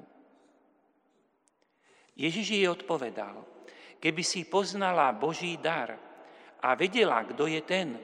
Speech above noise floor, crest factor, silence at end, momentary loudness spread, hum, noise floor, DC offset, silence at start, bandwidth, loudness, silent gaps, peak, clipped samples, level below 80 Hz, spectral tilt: 42 dB; 22 dB; 0 s; 13 LU; none; -72 dBFS; under 0.1%; 2.15 s; 11 kHz; -29 LUFS; none; -10 dBFS; under 0.1%; -88 dBFS; -3.5 dB/octave